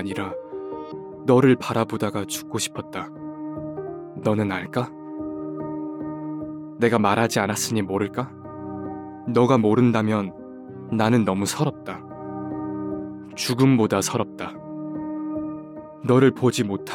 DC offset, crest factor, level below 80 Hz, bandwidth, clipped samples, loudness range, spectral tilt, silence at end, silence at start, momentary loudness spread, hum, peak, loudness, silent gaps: under 0.1%; 18 dB; -64 dBFS; 17.5 kHz; under 0.1%; 6 LU; -5.5 dB/octave; 0 s; 0 s; 17 LU; none; -4 dBFS; -24 LUFS; none